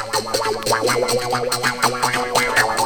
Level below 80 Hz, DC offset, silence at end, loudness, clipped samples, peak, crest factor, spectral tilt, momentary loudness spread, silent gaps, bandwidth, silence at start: -46 dBFS; under 0.1%; 0 s; -19 LUFS; under 0.1%; -2 dBFS; 18 dB; -2 dB/octave; 4 LU; none; over 20 kHz; 0 s